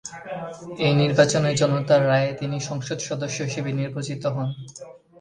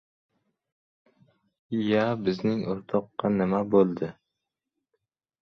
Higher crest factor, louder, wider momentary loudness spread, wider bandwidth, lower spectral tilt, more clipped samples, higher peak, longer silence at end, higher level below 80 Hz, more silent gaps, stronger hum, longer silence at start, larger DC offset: about the same, 20 dB vs 20 dB; first, -23 LUFS vs -26 LUFS; first, 16 LU vs 9 LU; first, 10 kHz vs 6.4 kHz; second, -5.5 dB/octave vs -8.5 dB/octave; neither; first, -2 dBFS vs -10 dBFS; second, 0.25 s vs 1.3 s; first, -58 dBFS vs -64 dBFS; neither; neither; second, 0.05 s vs 1.7 s; neither